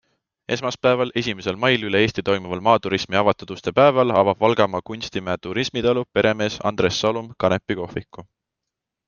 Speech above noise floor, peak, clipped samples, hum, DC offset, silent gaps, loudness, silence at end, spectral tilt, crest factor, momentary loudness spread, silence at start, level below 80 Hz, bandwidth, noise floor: 63 dB; 0 dBFS; under 0.1%; none; under 0.1%; none; -21 LUFS; 0.85 s; -5 dB/octave; 20 dB; 10 LU; 0.5 s; -54 dBFS; 7.2 kHz; -84 dBFS